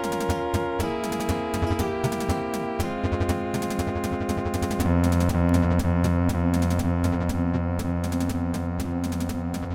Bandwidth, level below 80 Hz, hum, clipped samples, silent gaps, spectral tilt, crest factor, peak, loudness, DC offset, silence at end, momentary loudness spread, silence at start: 17.5 kHz; -40 dBFS; none; under 0.1%; none; -6.5 dB/octave; 14 dB; -10 dBFS; -25 LUFS; under 0.1%; 0 s; 6 LU; 0 s